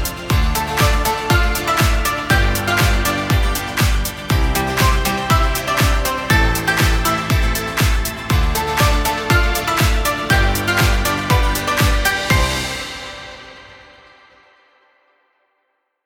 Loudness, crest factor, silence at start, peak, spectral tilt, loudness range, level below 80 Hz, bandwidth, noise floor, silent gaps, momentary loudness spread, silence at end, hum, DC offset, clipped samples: -17 LUFS; 16 dB; 0 s; 0 dBFS; -4 dB/octave; 4 LU; -22 dBFS; 19 kHz; -69 dBFS; none; 4 LU; 2.3 s; none; under 0.1%; under 0.1%